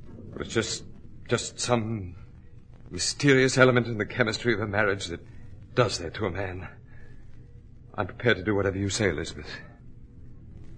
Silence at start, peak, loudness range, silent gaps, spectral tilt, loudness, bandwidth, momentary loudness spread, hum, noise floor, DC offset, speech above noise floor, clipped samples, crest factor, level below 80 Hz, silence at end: 0 s; -2 dBFS; 6 LU; none; -4.5 dB/octave; -26 LUFS; 10.5 kHz; 20 LU; none; -47 dBFS; under 0.1%; 21 dB; under 0.1%; 26 dB; -48 dBFS; 0 s